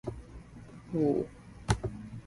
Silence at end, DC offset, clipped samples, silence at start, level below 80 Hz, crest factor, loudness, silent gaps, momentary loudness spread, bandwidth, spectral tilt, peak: 0 s; under 0.1%; under 0.1%; 0.05 s; -48 dBFS; 22 dB; -33 LUFS; none; 21 LU; 11.5 kHz; -6.5 dB/octave; -12 dBFS